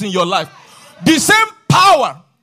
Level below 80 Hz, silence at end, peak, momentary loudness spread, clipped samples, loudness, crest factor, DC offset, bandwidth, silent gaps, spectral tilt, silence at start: -50 dBFS; 0.3 s; -2 dBFS; 10 LU; under 0.1%; -12 LUFS; 12 dB; under 0.1%; 15.5 kHz; none; -3.5 dB/octave; 0 s